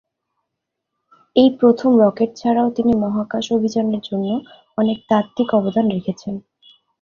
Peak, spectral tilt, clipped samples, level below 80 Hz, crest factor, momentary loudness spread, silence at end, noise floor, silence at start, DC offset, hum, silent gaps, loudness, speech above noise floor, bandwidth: -2 dBFS; -7 dB/octave; under 0.1%; -56 dBFS; 18 dB; 12 LU; 0.6 s; -79 dBFS; 1.35 s; under 0.1%; none; none; -18 LUFS; 62 dB; 7.2 kHz